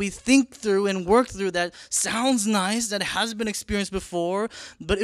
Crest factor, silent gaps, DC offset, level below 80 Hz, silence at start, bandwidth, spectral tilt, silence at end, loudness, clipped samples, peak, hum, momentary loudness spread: 20 dB; none; under 0.1%; -46 dBFS; 0 s; 14 kHz; -3.5 dB/octave; 0 s; -24 LUFS; under 0.1%; -4 dBFS; none; 8 LU